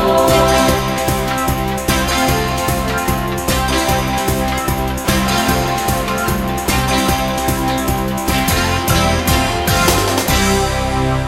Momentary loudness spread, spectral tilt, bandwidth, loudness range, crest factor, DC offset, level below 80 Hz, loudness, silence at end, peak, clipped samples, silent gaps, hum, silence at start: 5 LU; -4 dB/octave; 16.5 kHz; 2 LU; 16 dB; under 0.1%; -26 dBFS; -15 LUFS; 0 s; 0 dBFS; under 0.1%; none; none; 0 s